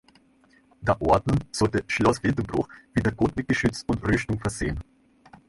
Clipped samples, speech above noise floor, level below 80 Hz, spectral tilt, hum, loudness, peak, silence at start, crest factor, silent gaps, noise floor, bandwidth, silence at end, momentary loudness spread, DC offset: under 0.1%; 35 dB; -42 dBFS; -6 dB/octave; none; -25 LUFS; -6 dBFS; 0.8 s; 20 dB; none; -60 dBFS; 11.5 kHz; 0.65 s; 8 LU; under 0.1%